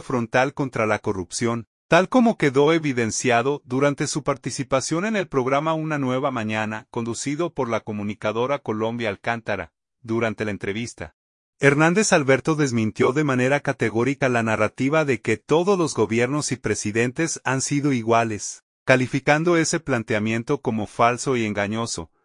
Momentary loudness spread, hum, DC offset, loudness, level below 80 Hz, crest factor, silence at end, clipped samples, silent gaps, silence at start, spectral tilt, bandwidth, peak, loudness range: 9 LU; none; under 0.1%; -22 LUFS; -58 dBFS; 20 dB; 0.2 s; under 0.1%; 1.67-1.89 s, 11.13-11.53 s, 18.63-18.86 s; 0 s; -5 dB/octave; 11 kHz; -2 dBFS; 5 LU